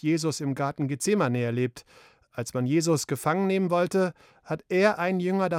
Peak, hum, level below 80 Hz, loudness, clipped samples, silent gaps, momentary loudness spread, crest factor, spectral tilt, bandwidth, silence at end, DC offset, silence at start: -8 dBFS; none; -68 dBFS; -26 LUFS; under 0.1%; none; 9 LU; 18 dB; -5.5 dB/octave; 16.5 kHz; 0 s; under 0.1%; 0.05 s